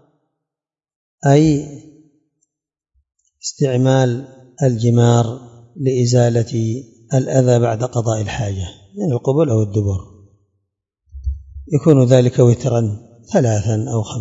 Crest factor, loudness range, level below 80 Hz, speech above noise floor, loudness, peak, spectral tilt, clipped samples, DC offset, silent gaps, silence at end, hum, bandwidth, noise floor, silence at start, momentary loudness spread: 18 dB; 5 LU; -40 dBFS; 74 dB; -16 LUFS; 0 dBFS; -7 dB/octave; under 0.1%; under 0.1%; none; 0 s; none; 7.8 kHz; -89 dBFS; 1.25 s; 15 LU